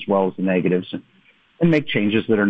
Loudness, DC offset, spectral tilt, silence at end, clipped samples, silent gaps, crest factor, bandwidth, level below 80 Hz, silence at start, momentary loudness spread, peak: -20 LUFS; under 0.1%; -8.5 dB/octave; 0 s; under 0.1%; none; 14 dB; 6 kHz; -56 dBFS; 0 s; 8 LU; -6 dBFS